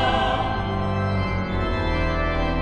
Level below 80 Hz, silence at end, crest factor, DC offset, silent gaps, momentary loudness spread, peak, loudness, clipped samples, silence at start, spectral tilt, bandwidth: -30 dBFS; 0 s; 14 dB; under 0.1%; none; 3 LU; -8 dBFS; -24 LUFS; under 0.1%; 0 s; -7 dB/octave; 8.8 kHz